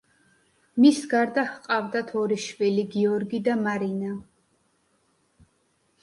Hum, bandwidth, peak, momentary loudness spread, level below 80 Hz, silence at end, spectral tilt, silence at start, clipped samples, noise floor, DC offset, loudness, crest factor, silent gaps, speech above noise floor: none; 11.5 kHz; -6 dBFS; 11 LU; -70 dBFS; 1.8 s; -5.5 dB/octave; 0.75 s; under 0.1%; -69 dBFS; under 0.1%; -25 LUFS; 20 dB; none; 45 dB